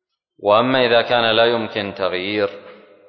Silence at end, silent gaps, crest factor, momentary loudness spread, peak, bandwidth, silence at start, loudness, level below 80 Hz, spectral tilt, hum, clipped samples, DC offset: 0.35 s; none; 16 dB; 9 LU; -2 dBFS; 6.2 kHz; 0.4 s; -17 LUFS; -58 dBFS; -7 dB/octave; none; under 0.1%; under 0.1%